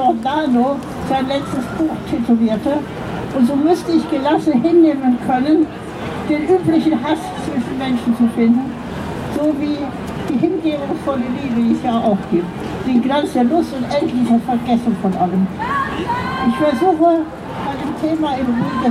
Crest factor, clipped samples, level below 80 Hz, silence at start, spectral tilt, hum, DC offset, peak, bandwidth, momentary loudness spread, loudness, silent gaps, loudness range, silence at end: 14 dB; under 0.1%; -42 dBFS; 0 s; -7 dB/octave; none; under 0.1%; -2 dBFS; 13 kHz; 9 LU; -17 LUFS; none; 3 LU; 0 s